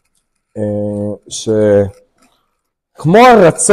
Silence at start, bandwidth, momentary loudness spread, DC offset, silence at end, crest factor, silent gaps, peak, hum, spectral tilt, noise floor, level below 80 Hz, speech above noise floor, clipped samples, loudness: 0.55 s; 15 kHz; 16 LU; under 0.1%; 0 s; 12 dB; none; 0 dBFS; none; -5 dB/octave; -69 dBFS; -44 dBFS; 60 dB; under 0.1%; -11 LUFS